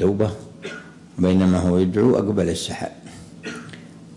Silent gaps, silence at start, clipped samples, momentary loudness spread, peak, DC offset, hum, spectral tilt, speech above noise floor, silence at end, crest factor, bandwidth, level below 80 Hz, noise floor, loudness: none; 0 s; under 0.1%; 21 LU; -6 dBFS; under 0.1%; none; -7 dB/octave; 21 dB; 0 s; 16 dB; 11.5 kHz; -54 dBFS; -40 dBFS; -20 LUFS